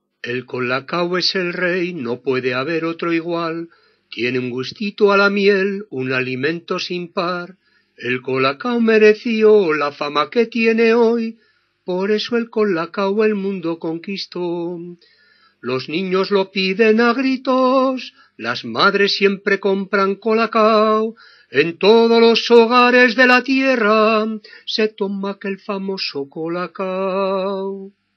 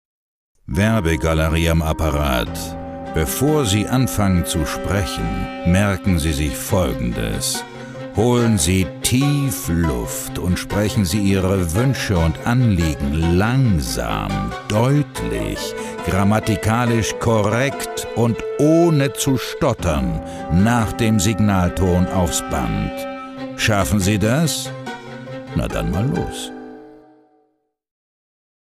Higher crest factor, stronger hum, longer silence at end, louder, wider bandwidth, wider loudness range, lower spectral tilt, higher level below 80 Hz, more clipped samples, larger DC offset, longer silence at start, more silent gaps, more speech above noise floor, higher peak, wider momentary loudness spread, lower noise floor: about the same, 18 dB vs 16 dB; neither; second, 0.25 s vs 1.8 s; about the same, -17 LUFS vs -19 LUFS; second, 6.6 kHz vs 16 kHz; first, 9 LU vs 3 LU; about the same, -5.5 dB/octave vs -5.5 dB/octave; second, -80 dBFS vs -32 dBFS; neither; neither; second, 0.25 s vs 0.65 s; neither; second, 35 dB vs 48 dB; about the same, 0 dBFS vs -2 dBFS; first, 13 LU vs 9 LU; second, -52 dBFS vs -66 dBFS